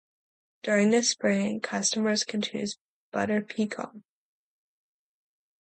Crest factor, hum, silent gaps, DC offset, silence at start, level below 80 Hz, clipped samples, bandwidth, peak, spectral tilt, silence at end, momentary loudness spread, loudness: 18 dB; none; 2.81-3.12 s; under 0.1%; 0.65 s; -72 dBFS; under 0.1%; 9.2 kHz; -12 dBFS; -3.5 dB/octave; 1.6 s; 14 LU; -27 LUFS